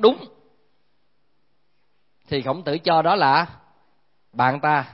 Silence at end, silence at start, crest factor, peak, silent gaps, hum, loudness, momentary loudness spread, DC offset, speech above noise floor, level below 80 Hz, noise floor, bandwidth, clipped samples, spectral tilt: 0.1 s; 0 s; 22 dB; -2 dBFS; none; none; -21 LUFS; 13 LU; 0.1%; 52 dB; -64 dBFS; -72 dBFS; 5.8 kHz; under 0.1%; -10 dB/octave